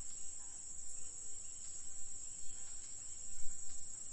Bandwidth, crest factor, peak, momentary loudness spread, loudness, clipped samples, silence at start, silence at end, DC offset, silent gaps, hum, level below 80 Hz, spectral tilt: 10.5 kHz; 16 dB; -22 dBFS; 1 LU; -47 LUFS; under 0.1%; 0 s; 0 s; under 0.1%; none; none; -58 dBFS; -0.5 dB/octave